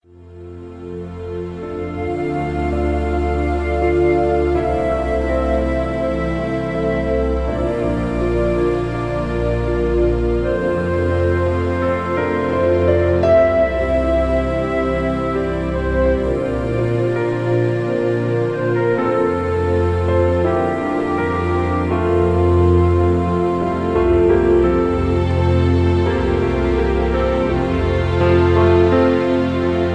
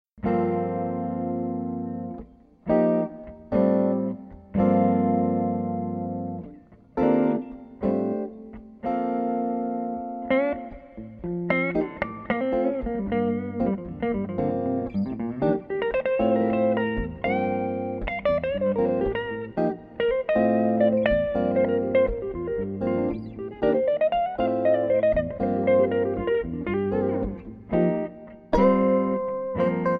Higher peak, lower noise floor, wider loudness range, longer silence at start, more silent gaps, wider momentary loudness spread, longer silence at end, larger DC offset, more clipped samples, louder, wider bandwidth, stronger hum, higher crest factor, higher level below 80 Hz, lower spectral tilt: first, -2 dBFS vs -8 dBFS; second, -37 dBFS vs -48 dBFS; about the same, 4 LU vs 4 LU; about the same, 0.2 s vs 0.15 s; neither; second, 7 LU vs 11 LU; about the same, 0 s vs 0 s; neither; neither; first, -17 LUFS vs -25 LUFS; first, 9.4 kHz vs 5.2 kHz; neither; about the same, 14 dB vs 18 dB; first, -28 dBFS vs -44 dBFS; about the same, -8.5 dB/octave vs -9.5 dB/octave